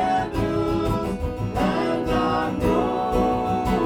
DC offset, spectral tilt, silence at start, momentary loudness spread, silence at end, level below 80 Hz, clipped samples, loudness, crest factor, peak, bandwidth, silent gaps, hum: under 0.1%; -7 dB/octave; 0 s; 3 LU; 0 s; -34 dBFS; under 0.1%; -23 LUFS; 14 dB; -8 dBFS; 18.5 kHz; none; none